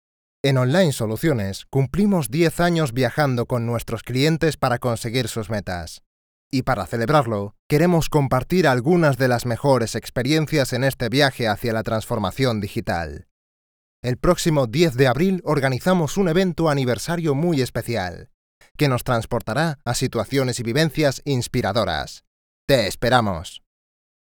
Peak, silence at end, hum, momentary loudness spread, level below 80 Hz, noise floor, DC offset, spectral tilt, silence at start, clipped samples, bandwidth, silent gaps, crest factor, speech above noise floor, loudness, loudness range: -2 dBFS; 0.85 s; none; 8 LU; -42 dBFS; under -90 dBFS; under 0.1%; -5.5 dB/octave; 0.45 s; under 0.1%; over 20 kHz; 6.06-6.51 s, 7.59-7.70 s, 13.31-14.03 s, 18.34-18.61 s, 18.71-18.75 s, 22.27-22.68 s; 18 dB; over 70 dB; -21 LUFS; 4 LU